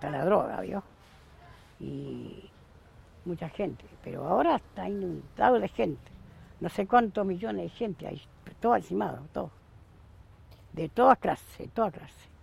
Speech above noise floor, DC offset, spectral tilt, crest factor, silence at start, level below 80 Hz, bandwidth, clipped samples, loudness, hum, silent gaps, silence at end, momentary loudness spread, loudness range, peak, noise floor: 26 dB; under 0.1%; -7.5 dB/octave; 24 dB; 0 s; -56 dBFS; 15.5 kHz; under 0.1%; -30 LUFS; none; none; 0.35 s; 19 LU; 9 LU; -6 dBFS; -55 dBFS